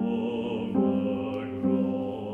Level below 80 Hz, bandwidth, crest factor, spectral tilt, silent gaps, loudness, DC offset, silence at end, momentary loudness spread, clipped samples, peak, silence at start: -60 dBFS; 3.7 kHz; 16 dB; -9.5 dB/octave; none; -28 LUFS; under 0.1%; 0 s; 5 LU; under 0.1%; -12 dBFS; 0 s